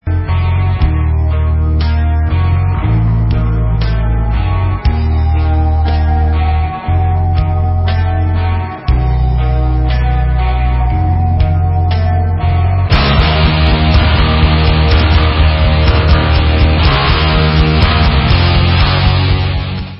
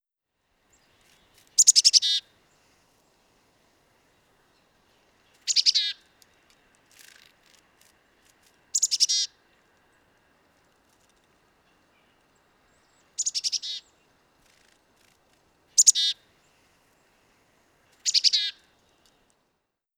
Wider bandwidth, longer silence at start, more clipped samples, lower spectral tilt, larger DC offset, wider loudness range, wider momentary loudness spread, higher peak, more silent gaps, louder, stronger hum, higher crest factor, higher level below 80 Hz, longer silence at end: second, 5.8 kHz vs over 20 kHz; second, 0.05 s vs 1.6 s; neither; first, -9.5 dB/octave vs 5 dB/octave; neither; second, 4 LU vs 11 LU; second, 4 LU vs 17 LU; about the same, 0 dBFS vs -2 dBFS; neither; first, -12 LUFS vs -21 LUFS; neither; second, 10 dB vs 28 dB; first, -14 dBFS vs -78 dBFS; second, 0 s vs 1.45 s